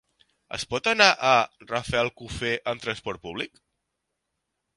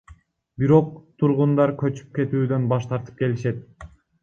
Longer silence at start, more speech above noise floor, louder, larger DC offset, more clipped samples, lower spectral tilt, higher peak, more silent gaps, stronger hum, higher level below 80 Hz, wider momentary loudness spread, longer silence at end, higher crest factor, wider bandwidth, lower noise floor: first, 0.5 s vs 0.1 s; first, 56 dB vs 30 dB; about the same, -24 LUFS vs -22 LUFS; neither; neither; second, -3 dB/octave vs -9.5 dB/octave; first, 0 dBFS vs -4 dBFS; neither; neither; about the same, -54 dBFS vs -54 dBFS; first, 16 LU vs 10 LU; first, 1.3 s vs 0.35 s; first, 26 dB vs 18 dB; first, 11.5 kHz vs 7.2 kHz; first, -81 dBFS vs -51 dBFS